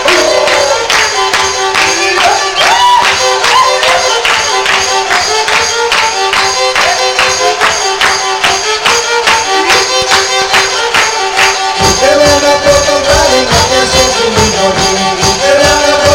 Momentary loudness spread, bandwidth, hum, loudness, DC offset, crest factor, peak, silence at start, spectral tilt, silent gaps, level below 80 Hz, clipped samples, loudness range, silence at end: 3 LU; 17.5 kHz; none; -7 LUFS; under 0.1%; 8 dB; 0 dBFS; 0 s; -1.5 dB/octave; none; -32 dBFS; 0.2%; 1 LU; 0 s